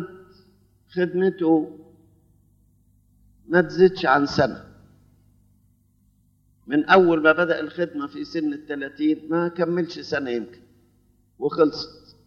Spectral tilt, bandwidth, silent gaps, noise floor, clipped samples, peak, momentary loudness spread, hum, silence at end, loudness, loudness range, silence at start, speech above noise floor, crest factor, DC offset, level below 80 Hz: -7 dB/octave; 7 kHz; none; -62 dBFS; under 0.1%; -4 dBFS; 15 LU; 50 Hz at -60 dBFS; 0.35 s; -22 LUFS; 5 LU; 0 s; 40 dB; 20 dB; under 0.1%; -60 dBFS